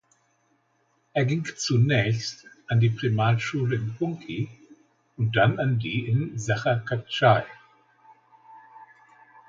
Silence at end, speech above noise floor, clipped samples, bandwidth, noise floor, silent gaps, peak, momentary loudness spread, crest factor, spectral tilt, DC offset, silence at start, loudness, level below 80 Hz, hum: 0.65 s; 45 dB; under 0.1%; 7.6 kHz; -68 dBFS; none; -6 dBFS; 11 LU; 20 dB; -6 dB/octave; under 0.1%; 1.15 s; -25 LUFS; -60 dBFS; none